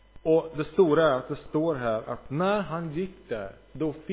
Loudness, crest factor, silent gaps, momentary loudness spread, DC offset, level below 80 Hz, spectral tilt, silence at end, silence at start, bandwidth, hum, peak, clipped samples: -27 LUFS; 16 dB; none; 13 LU; under 0.1%; -54 dBFS; -11 dB/octave; 0 s; 0.15 s; 4 kHz; none; -10 dBFS; under 0.1%